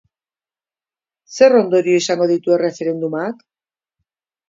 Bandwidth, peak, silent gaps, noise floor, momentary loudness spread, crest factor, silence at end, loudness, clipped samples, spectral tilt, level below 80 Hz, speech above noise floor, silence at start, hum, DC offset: 7.8 kHz; 0 dBFS; none; under -90 dBFS; 14 LU; 18 dB; 1.15 s; -16 LUFS; under 0.1%; -5 dB/octave; -70 dBFS; over 75 dB; 1.3 s; none; under 0.1%